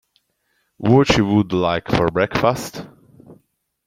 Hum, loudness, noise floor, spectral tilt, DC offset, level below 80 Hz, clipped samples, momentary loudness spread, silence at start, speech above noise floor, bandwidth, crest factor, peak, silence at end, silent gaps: none; -18 LUFS; -68 dBFS; -6 dB/octave; under 0.1%; -42 dBFS; under 0.1%; 13 LU; 0.8 s; 51 dB; 16 kHz; 18 dB; -2 dBFS; 0.55 s; none